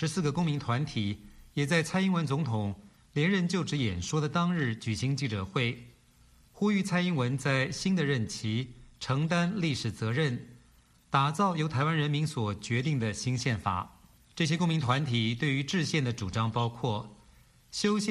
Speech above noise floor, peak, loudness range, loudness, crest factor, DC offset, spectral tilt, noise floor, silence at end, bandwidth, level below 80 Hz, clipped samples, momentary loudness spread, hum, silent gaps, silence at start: 32 dB; -10 dBFS; 1 LU; -30 LUFS; 20 dB; under 0.1%; -5.5 dB/octave; -61 dBFS; 0 s; 12.5 kHz; -58 dBFS; under 0.1%; 7 LU; none; none; 0 s